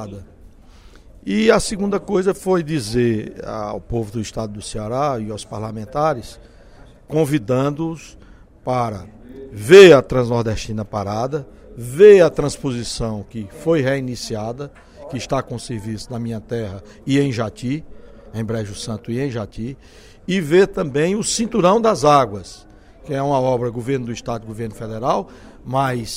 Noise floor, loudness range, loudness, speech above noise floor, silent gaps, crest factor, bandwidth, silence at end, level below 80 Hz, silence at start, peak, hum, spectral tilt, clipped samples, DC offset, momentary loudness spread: -44 dBFS; 10 LU; -18 LUFS; 26 dB; none; 18 dB; 15.5 kHz; 0 s; -42 dBFS; 0 s; 0 dBFS; none; -5.5 dB/octave; under 0.1%; under 0.1%; 17 LU